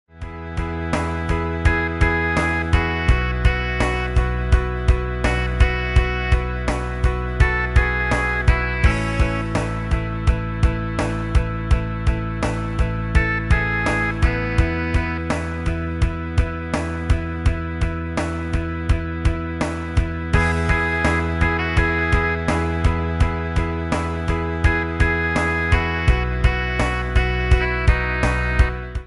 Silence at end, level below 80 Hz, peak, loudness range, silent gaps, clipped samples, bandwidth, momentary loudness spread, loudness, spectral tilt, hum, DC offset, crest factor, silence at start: 0 s; -22 dBFS; -2 dBFS; 3 LU; none; under 0.1%; 11.5 kHz; 5 LU; -21 LUFS; -6.5 dB/octave; none; under 0.1%; 18 dB; 0.15 s